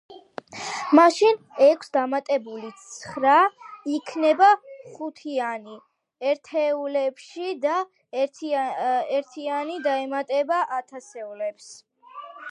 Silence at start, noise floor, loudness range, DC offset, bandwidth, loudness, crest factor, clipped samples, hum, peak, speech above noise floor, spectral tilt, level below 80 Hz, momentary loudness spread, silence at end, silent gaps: 0.1 s; -42 dBFS; 7 LU; under 0.1%; 11 kHz; -23 LUFS; 22 dB; under 0.1%; none; -2 dBFS; 20 dB; -3.5 dB/octave; -78 dBFS; 20 LU; 0 s; none